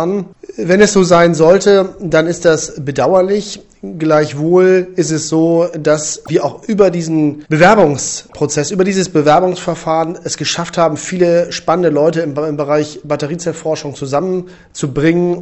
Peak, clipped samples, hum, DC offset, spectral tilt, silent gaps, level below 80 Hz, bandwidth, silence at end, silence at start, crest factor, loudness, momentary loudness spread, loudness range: 0 dBFS; under 0.1%; none; under 0.1%; -5 dB/octave; none; -46 dBFS; 8.4 kHz; 0 s; 0 s; 12 dB; -13 LUFS; 11 LU; 4 LU